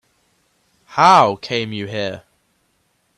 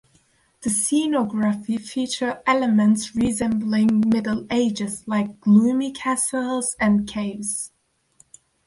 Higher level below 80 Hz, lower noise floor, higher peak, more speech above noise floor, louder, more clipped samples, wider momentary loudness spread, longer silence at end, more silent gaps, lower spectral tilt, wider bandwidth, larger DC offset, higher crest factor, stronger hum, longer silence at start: second, -62 dBFS vs -54 dBFS; first, -65 dBFS vs -61 dBFS; first, 0 dBFS vs -6 dBFS; first, 49 dB vs 40 dB; first, -16 LUFS vs -21 LUFS; neither; first, 16 LU vs 9 LU; about the same, 1 s vs 1 s; neither; about the same, -4.5 dB/octave vs -4.5 dB/octave; about the same, 12.5 kHz vs 11.5 kHz; neither; about the same, 20 dB vs 16 dB; neither; first, 0.9 s vs 0.6 s